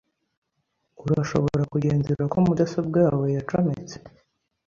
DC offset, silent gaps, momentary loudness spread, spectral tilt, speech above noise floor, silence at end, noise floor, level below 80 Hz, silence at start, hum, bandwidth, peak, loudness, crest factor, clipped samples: under 0.1%; none; 12 LU; -8.5 dB/octave; 53 dB; 0.6 s; -76 dBFS; -52 dBFS; 1 s; none; 7.4 kHz; -6 dBFS; -23 LUFS; 18 dB; under 0.1%